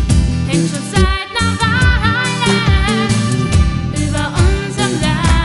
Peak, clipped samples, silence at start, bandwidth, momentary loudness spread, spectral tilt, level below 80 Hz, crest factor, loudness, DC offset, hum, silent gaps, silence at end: 0 dBFS; under 0.1%; 0 s; 11.5 kHz; 4 LU; -5 dB/octave; -18 dBFS; 14 dB; -14 LUFS; 0.2%; none; none; 0 s